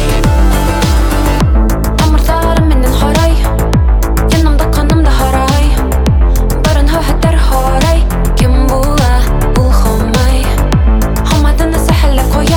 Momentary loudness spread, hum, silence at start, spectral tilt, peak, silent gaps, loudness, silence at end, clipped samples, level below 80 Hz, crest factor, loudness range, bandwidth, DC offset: 2 LU; none; 0 s; -6 dB/octave; 0 dBFS; none; -11 LUFS; 0 s; under 0.1%; -10 dBFS; 8 dB; 0 LU; 18 kHz; under 0.1%